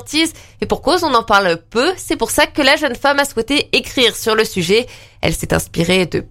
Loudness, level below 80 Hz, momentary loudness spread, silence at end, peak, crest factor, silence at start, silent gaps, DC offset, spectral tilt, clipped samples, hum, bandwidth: -15 LUFS; -36 dBFS; 7 LU; 0.05 s; 0 dBFS; 16 dB; 0 s; none; under 0.1%; -3.5 dB/octave; under 0.1%; none; 16.5 kHz